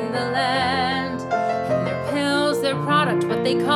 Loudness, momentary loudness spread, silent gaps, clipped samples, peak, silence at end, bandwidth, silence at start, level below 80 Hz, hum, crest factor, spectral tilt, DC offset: -21 LUFS; 4 LU; none; under 0.1%; -6 dBFS; 0 s; 15 kHz; 0 s; -54 dBFS; none; 14 dB; -5.5 dB/octave; under 0.1%